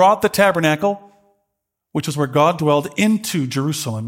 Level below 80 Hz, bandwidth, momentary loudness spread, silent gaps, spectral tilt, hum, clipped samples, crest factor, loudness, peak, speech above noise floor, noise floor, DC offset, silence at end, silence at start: -60 dBFS; 17 kHz; 9 LU; none; -5 dB/octave; none; under 0.1%; 18 dB; -18 LUFS; 0 dBFS; 60 dB; -77 dBFS; under 0.1%; 0 s; 0 s